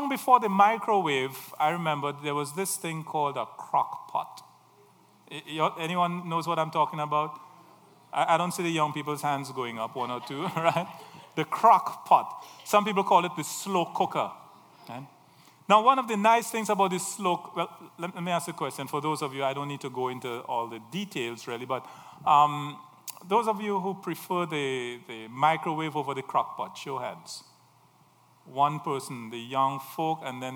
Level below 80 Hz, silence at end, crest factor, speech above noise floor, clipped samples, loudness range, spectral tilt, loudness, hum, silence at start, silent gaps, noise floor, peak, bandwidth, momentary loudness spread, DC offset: -84 dBFS; 0 s; 22 dB; 33 dB; under 0.1%; 7 LU; -4.5 dB/octave; -28 LUFS; none; 0 s; none; -61 dBFS; -6 dBFS; over 20 kHz; 15 LU; under 0.1%